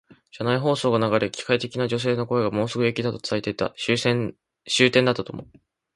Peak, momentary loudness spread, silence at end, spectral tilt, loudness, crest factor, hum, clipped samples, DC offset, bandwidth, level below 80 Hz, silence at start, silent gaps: -4 dBFS; 9 LU; 0.5 s; -5 dB/octave; -23 LUFS; 20 dB; none; under 0.1%; under 0.1%; 11.5 kHz; -58 dBFS; 0.35 s; none